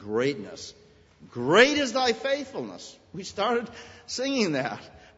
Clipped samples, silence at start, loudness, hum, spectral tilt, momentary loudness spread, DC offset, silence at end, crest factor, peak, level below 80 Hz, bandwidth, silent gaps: under 0.1%; 0 s; -25 LUFS; none; -3.5 dB/octave; 22 LU; under 0.1%; 0.2 s; 24 dB; -4 dBFS; -64 dBFS; 8 kHz; none